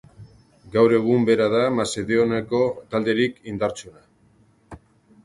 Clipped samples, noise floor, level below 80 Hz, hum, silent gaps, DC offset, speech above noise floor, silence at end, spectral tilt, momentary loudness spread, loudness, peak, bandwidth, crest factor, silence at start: under 0.1%; -58 dBFS; -56 dBFS; none; none; under 0.1%; 37 dB; 0.5 s; -5.5 dB/octave; 9 LU; -21 LUFS; -4 dBFS; 11.5 kHz; 18 dB; 0.2 s